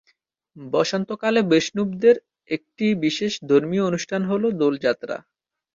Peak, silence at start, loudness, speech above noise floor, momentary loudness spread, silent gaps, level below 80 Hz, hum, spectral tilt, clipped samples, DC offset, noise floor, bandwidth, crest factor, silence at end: -4 dBFS; 0.55 s; -22 LUFS; 46 dB; 11 LU; none; -64 dBFS; none; -5.5 dB/octave; under 0.1%; under 0.1%; -67 dBFS; 7.6 kHz; 18 dB; 0.55 s